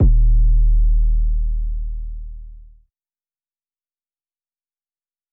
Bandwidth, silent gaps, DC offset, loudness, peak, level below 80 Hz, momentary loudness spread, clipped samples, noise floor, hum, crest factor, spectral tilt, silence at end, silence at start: 0.7 kHz; none; under 0.1%; -20 LUFS; -6 dBFS; -18 dBFS; 18 LU; under 0.1%; under -90 dBFS; none; 12 dB; -15 dB/octave; 2.75 s; 0 s